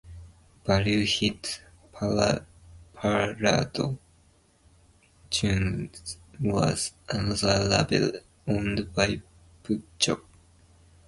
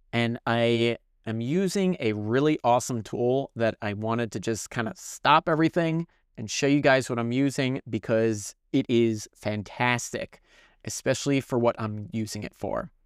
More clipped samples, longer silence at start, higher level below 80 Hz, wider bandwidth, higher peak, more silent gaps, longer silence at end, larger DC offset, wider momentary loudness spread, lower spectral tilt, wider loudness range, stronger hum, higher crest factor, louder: neither; about the same, 0.05 s vs 0.15 s; first, -46 dBFS vs -60 dBFS; second, 11.5 kHz vs 15.5 kHz; about the same, -6 dBFS vs -6 dBFS; neither; first, 0.85 s vs 0.15 s; neither; about the same, 13 LU vs 11 LU; about the same, -4.5 dB/octave vs -5 dB/octave; about the same, 4 LU vs 4 LU; neither; about the same, 22 dB vs 20 dB; about the same, -27 LUFS vs -26 LUFS